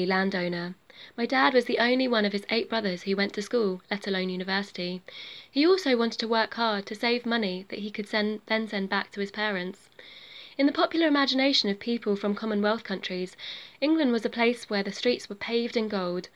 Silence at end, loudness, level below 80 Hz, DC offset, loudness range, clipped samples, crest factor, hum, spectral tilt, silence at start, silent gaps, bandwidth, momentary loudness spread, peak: 0.1 s; -27 LUFS; -74 dBFS; under 0.1%; 3 LU; under 0.1%; 22 dB; none; -5 dB/octave; 0 s; none; 12.5 kHz; 13 LU; -6 dBFS